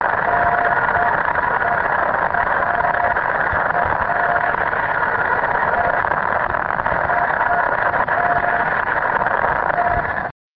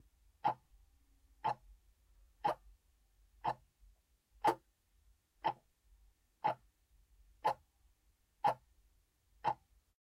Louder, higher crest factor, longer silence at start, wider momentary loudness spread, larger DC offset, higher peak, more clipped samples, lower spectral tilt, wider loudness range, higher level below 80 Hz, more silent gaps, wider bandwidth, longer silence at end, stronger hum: first, -18 LUFS vs -41 LUFS; second, 16 dB vs 26 dB; second, 0 s vs 0.45 s; second, 2 LU vs 11 LU; neither; first, -2 dBFS vs -18 dBFS; neither; first, -8.5 dB/octave vs -5 dB/octave; about the same, 1 LU vs 2 LU; first, -40 dBFS vs -70 dBFS; neither; second, 5.6 kHz vs 16 kHz; second, 0.25 s vs 0.45 s; neither